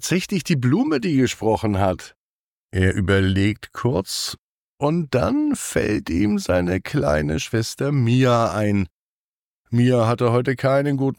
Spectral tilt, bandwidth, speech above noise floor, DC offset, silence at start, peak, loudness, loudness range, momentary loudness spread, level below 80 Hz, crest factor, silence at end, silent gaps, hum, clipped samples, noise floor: -6 dB/octave; 18.5 kHz; over 70 dB; under 0.1%; 0 s; -6 dBFS; -21 LUFS; 2 LU; 7 LU; -46 dBFS; 14 dB; 0.05 s; 2.16-2.69 s, 4.39-4.78 s, 8.91-9.65 s; none; under 0.1%; under -90 dBFS